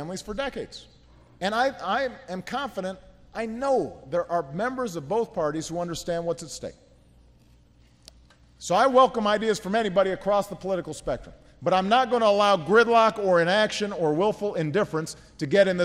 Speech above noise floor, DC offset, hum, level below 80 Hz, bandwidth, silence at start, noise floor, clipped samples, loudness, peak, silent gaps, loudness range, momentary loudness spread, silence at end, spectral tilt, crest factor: 33 dB; under 0.1%; none; -54 dBFS; 15 kHz; 0 s; -57 dBFS; under 0.1%; -25 LUFS; -6 dBFS; none; 9 LU; 15 LU; 0 s; -4.5 dB/octave; 18 dB